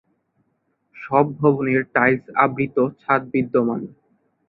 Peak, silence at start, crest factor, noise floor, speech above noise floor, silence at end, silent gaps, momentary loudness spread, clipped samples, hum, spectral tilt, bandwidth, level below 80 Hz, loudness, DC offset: -2 dBFS; 0.95 s; 20 dB; -70 dBFS; 50 dB; 0.6 s; none; 7 LU; under 0.1%; none; -11.5 dB/octave; 4.7 kHz; -60 dBFS; -20 LUFS; under 0.1%